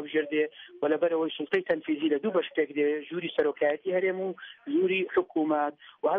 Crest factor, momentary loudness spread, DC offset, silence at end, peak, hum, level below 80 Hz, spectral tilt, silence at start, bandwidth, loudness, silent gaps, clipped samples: 16 dB; 6 LU; under 0.1%; 0 s; -12 dBFS; none; -76 dBFS; -3 dB/octave; 0 s; 4.5 kHz; -28 LUFS; none; under 0.1%